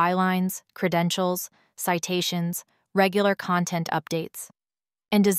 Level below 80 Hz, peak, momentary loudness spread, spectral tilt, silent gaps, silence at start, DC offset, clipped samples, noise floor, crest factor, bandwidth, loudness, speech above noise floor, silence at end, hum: -70 dBFS; -6 dBFS; 11 LU; -4.5 dB/octave; none; 0 s; under 0.1%; under 0.1%; under -90 dBFS; 20 dB; 16 kHz; -25 LUFS; over 66 dB; 0 s; none